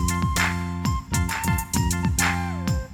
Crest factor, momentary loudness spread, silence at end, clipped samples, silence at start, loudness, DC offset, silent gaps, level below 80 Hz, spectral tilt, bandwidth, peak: 16 dB; 5 LU; 0 s; under 0.1%; 0 s; -24 LUFS; under 0.1%; none; -32 dBFS; -4 dB/octave; 19.5 kHz; -8 dBFS